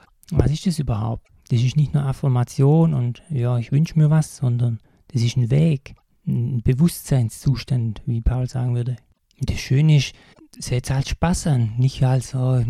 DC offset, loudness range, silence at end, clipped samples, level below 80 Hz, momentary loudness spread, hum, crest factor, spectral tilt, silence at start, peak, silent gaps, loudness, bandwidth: under 0.1%; 3 LU; 0 s; under 0.1%; -36 dBFS; 10 LU; none; 18 dB; -7 dB/octave; 0.3 s; -2 dBFS; none; -21 LUFS; 13.5 kHz